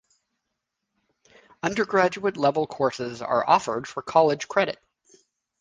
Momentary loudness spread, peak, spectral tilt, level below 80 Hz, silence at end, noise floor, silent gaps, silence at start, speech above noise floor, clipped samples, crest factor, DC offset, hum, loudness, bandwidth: 10 LU; -4 dBFS; -5 dB/octave; -64 dBFS; 0.85 s; -81 dBFS; none; 1.65 s; 58 dB; under 0.1%; 22 dB; under 0.1%; none; -24 LUFS; 9.8 kHz